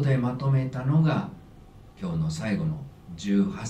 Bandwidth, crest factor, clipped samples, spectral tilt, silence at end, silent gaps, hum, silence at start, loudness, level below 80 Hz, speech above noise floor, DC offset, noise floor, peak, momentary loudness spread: 9.2 kHz; 14 dB; under 0.1%; -7.5 dB/octave; 0 s; none; none; 0 s; -27 LUFS; -50 dBFS; 23 dB; under 0.1%; -49 dBFS; -12 dBFS; 14 LU